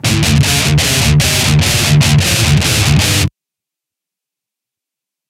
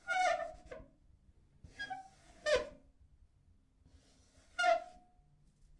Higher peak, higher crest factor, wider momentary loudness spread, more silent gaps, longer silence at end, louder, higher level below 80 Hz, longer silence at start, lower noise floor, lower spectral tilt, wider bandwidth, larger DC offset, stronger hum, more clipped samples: first, 0 dBFS vs -20 dBFS; second, 12 dB vs 20 dB; second, 2 LU vs 22 LU; neither; first, 2 s vs 0.9 s; first, -10 LUFS vs -37 LUFS; first, -26 dBFS vs -64 dBFS; about the same, 0.05 s vs 0.05 s; first, -84 dBFS vs -68 dBFS; first, -3.5 dB/octave vs -2 dB/octave; first, 16.5 kHz vs 11.5 kHz; neither; neither; neither